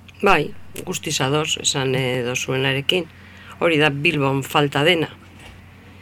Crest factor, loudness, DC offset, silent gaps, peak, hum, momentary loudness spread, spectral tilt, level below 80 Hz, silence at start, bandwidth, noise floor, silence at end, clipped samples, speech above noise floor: 20 dB; -19 LUFS; under 0.1%; none; -2 dBFS; none; 11 LU; -4 dB/octave; -50 dBFS; 0.15 s; 18 kHz; -43 dBFS; 0 s; under 0.1%; 23 dB